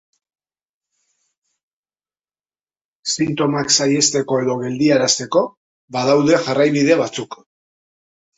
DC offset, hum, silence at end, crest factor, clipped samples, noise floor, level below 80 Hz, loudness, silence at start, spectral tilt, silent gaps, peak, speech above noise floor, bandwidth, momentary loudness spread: under 0.1%; none; 1.05 s; 18 dB; under 0.1%; under -90 dBFS; -60 dBFS; -17 LUFS; 3.05 s; -3.5 dB/octave; 5.57-5.88 s; -2 dBFS; over 73 dB; 8.2 kHz; 11 LU